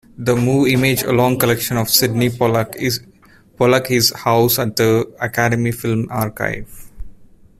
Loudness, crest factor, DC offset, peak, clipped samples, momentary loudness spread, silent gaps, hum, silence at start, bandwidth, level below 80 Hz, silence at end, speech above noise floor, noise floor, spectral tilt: -16 LUFS; 18 dB; under 0.1%; 0 dBFS; under 0.1%; 7 LU; none; none; 0.2 s; 16 kHz; -44 dBFS; 0.35 s; 26 dB; -42 dBFS; -4.5 dB/octave